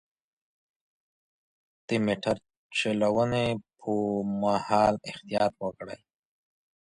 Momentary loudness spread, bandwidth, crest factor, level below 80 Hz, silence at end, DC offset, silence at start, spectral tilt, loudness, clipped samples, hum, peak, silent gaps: 11 LU; 11 kHz; 22 dB; -60 dBFS; 0.85 s; under 0.1%; 1.9 s; -6 dB/octave; -28 LUFS; under 0.1%; none; -8 dBFS; 2.57-2.70 s